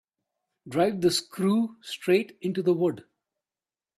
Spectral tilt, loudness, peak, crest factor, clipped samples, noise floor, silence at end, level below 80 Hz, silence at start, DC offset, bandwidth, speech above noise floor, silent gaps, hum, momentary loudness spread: -5.5 dB/octave; -26 LUFS; -10 dBFS; 18 dB; under 0.1%; under -90 dBFS; 0.95 s; -68 dBFS; 0.65 s; under 0.1%; 14.5 kHz; over 64 dB; none; none; 8 LU